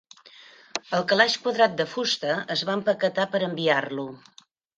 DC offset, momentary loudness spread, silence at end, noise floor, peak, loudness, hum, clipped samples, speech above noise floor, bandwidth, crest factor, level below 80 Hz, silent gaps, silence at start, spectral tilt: under 0.1%; 13 LU; 0.6 s; -50 dBFS; -4 dBFS; -24 LUFS; none; under 0.1%; 26 dB; 9.4 kHz; 22 dB; -72 dBFS; none; 0.75 s; -3.5 dB/octave